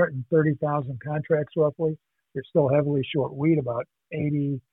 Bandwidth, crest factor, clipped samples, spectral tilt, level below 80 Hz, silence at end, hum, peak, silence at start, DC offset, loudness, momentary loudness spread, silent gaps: 3.9 kHz; 16 dB; under 0.1%; -11.5 dB/octave; -64 dBFS; 0.1 s; none; -10 dBFS; 0 s; under 0.1%; -25 LUFS; 10 LU; none